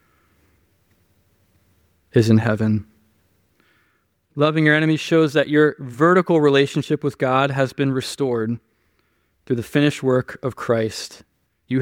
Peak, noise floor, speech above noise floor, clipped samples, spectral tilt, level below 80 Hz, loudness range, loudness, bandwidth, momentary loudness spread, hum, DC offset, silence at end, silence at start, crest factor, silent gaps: -2 dBFS; -65 dBFS; 47 dB; under 0.1%; -6.5 dB/octave; -60 dBFS; 6 LU; -19 LUFS; 16.5 kHz; 11 LU; none; under 0.1%; 0 s; 2.15 s; 18 dB; none